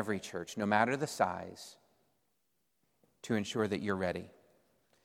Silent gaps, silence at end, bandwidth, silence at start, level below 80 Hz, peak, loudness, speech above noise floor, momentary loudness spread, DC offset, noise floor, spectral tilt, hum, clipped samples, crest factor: none; 0.75 s; 16 kHz; 0 s; -72 dBFS; -12 dBFS; -34 LUFS; 47 dB; 21 LU; under 0.1%; -81 dBFS; -5 dB/octave; none; under 0.1%; 24 dB